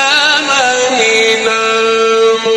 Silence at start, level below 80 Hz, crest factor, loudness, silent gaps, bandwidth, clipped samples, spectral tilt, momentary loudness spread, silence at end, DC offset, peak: 0 s; -54 dBFS; 10 dB; -10 LUFS; none; 12 kHz; under 0.1%; -0.5 dB/octave; 2 LU; 0 s; under 0.1%; 0 dBFS